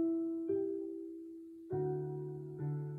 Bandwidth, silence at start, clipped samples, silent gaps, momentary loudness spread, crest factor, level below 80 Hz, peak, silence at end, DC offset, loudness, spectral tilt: 2.5 kHz; 0 s; under 0.1%; none; 12 LU; 14 dB; -74 dBFS; -26 dBFS; 0 s; under 0.1%; -40 LUFS; -12 dB/octave